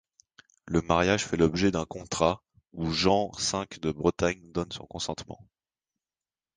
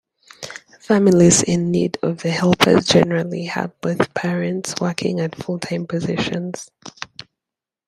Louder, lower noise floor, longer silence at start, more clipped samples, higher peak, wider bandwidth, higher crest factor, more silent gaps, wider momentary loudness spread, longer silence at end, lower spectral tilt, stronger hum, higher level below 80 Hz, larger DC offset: second, -28 LUFS vs -18 LUFS; about the same, under -90 dBFS vs -87 dBFS; first, 0.65 s vs 0.4 s; neither; second, -6 dBFS vs 0 dBFS; second, 10 kHz vs 14 kHz; about the same, 22 dB vs 18 dB; neither; second, 13 LU vs 21 LU; first, 1.2 s vs 0.85 s; about the same, -4.5 dB/octave vs -4.5 dB/octave; neither; about the same, -48 dBFS vs -52 dBFS; neither